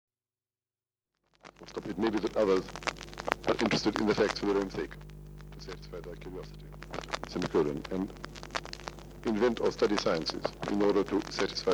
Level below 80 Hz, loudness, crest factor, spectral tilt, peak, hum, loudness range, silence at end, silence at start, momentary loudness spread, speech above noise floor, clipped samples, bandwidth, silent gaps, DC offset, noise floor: -52 dBFS; -31 LUFS; 26 dB; -5 dB/octave; -6 dBFS; none; 6 LU; 0 s; 1.45 s; 17 LU; over 59 dB; under 0.1%; over 20 kHz; none; under 0.1%; under -90 dBFS